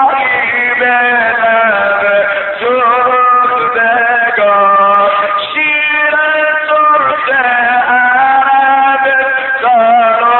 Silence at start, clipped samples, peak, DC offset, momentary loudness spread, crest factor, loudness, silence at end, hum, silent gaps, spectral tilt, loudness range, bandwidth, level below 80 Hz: 0 s; under 0.1%; 0 dBFS; under 0.1%; 3 LU; 10 dB; -9 LUFS; 0 s; none; none; 0.5 dB/octave; 1 LU; 4.3 kHz; -56 dBFS